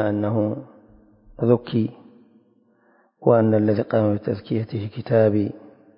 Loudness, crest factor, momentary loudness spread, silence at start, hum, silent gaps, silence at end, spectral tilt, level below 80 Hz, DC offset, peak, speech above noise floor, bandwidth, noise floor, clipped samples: -22 LUFS; 20 dB; 11 LU; 0 s; none; none; 0.4 s; -13 dB/octave; -54 dBFS; under 0.1%; -2 dBFS; 40 dB; 5.4 kHz; -60 dBFS; under 0.1%